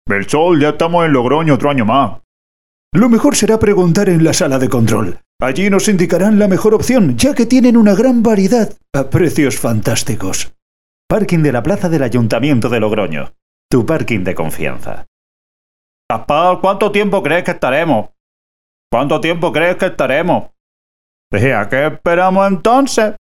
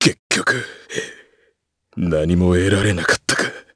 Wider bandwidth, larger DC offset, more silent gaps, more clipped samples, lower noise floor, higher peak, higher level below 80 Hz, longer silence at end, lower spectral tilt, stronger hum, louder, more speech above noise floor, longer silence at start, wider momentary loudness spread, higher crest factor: first, 17 kHz vs 11 kHz; first, 6% vs under 0.1%; first, 2.24-2.91 s, 5.26-5.39 s, 10.62-11.09 s, 13.42-13.69 s, 15.08-16.09 s, 18.20-18.90 s, 20.60-21.31 s vs 0.19-0.30 s; neither; first, under -90 dBFS vs -65 dBFS; about the same, 0 dBFS vs 0 dBFS; about the same, -40 dBFS vs -40 dBFS; about the same, 0.15 s vs 0.15 s; about the same, -5.5 dB/octave vs -4.5 dB/octave; neither; first, -13 LUFS vs -18 LUFS; first, over 78 dB vs 48 dB; about the same, 0.05 s vs 0 s; second, 9 LU vs 12 LU; about the same, 14 dB vs 18 dB